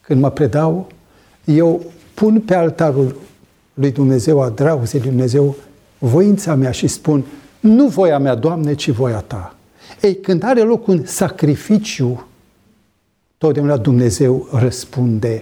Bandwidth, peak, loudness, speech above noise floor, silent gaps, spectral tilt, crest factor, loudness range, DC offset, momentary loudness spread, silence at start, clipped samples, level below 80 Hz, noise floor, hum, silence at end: 18.5 kHz; -2 dBFS; -15 LUFS; 49 dB; none; -7 dB/octave; 14 dB; 3 LU; under 0.1%; 9 LU; 0.1 s; under 0.1%; -48 dBFS; -63 dBFS; none; 0 s